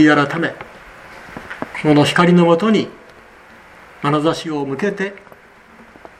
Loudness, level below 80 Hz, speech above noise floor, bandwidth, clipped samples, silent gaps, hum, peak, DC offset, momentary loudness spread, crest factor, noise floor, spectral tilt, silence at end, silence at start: -16 LUFS; -54 dBFS; 30 dB; 12 kHz; under 0.1%; none; none; 0 dBFS; under 0.1%; 23 LU; 18 dB; -44 dBFS; -6.5 dB/octave; 1 s; 0 s